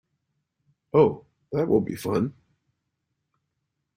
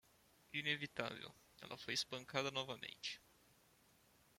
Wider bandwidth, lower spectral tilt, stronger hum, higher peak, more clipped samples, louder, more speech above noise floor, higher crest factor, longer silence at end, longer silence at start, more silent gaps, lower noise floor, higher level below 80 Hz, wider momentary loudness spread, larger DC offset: about the same, 16 kHz vs 16.5 kHz; first, -8 dB/octave vs -2.5 dB/octave; neither; first, -6 dBFS vs -22 dBFS; neither; first, -24 LUFS vs -44 LUFS; first, 57 dB vs 26 dB; second, 20 dB vs 26 dB; first, 1.65 s vs 1.2 s; first, 0.95 s vs 0.5 s; neither; first, -80 dBFS vs -72 dBFS; first, -60 dBFS vs -80 dBFS; about the same, 11 LU vs 13 LU; neither